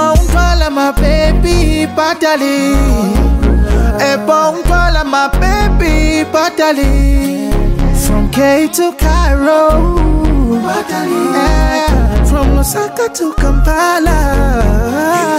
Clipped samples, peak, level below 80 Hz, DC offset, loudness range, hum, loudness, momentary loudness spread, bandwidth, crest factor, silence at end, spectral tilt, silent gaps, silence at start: under 0.1%; 0 dBFS; -14 dBFS; under 0.1%; 1 LU; none; -12 LUFS; 4 LU; 16 kHz; 10 dB; 0 s; -5.5 dB/octave; none; 0 s